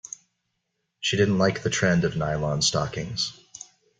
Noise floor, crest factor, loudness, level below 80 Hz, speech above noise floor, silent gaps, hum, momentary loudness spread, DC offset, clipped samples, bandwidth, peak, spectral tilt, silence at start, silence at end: -78 dBFS; 20 dB; -24 LUFS; -52 dBFS; 54 dB; none; none; 20 LU; under 0.1%; under 0.1%; 9.6 kHz; -8 dBFS; -4 dB/octave; 1 s; 0.35 s